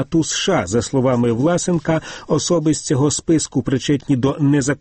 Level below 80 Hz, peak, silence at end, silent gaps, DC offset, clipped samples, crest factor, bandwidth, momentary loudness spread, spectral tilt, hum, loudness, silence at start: -44 dBFS; -6 dBFS; 0.05 s; none; under 0.1%; under 0.1%; 12 dB; 8.8 kHz; 3 LU; -5 dB/octave; none; -18 LUFS; 0 s